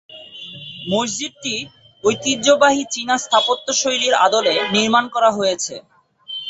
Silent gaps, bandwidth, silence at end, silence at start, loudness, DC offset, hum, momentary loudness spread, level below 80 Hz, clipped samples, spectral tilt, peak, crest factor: none; 8.2 kHz; 0 s; 0.1 s; -17 LUFS; under 0.1%; none; 18 LU; -60 dBFS; under 0.1%; -2 dB/octave; -2 dBFS; 18 dB